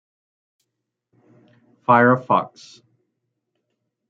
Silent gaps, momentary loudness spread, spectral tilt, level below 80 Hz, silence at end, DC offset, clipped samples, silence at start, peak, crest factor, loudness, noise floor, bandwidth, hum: none; 15 LU; -7.5 dB/octave; -72 dBFS; 1.6 s; under 0.1%; under 0.1%; 1.9 s; -2 dBFS; 22 dB; -17 LUFS; -80 dBFS; 7.6 kHz; none